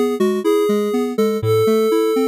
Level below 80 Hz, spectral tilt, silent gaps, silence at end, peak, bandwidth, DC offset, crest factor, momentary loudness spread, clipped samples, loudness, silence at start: -56 dBFS; -6.5 dB/octave; none; 0 s; -4 dBFS; 16 kHz; under 0.1%; 12 dB; 3 LU; under 0.1%; -17 LUFS; 0 s